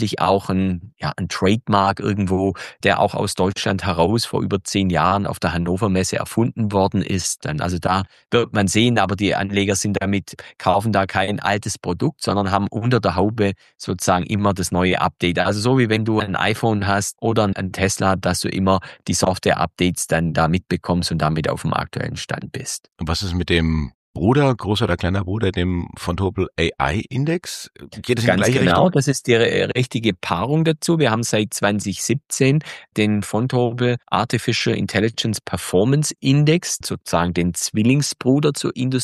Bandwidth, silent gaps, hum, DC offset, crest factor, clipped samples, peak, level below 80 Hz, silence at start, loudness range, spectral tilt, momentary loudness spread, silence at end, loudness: 13 kHz; 23.94-24.14 s; none; under 0.1%; 18 dB; under 0.1%; -2 dBFS; -42 dBFS; 0 s; 3 LU; -5 dB/octave; 6 LU; 0 s; -20 LUFS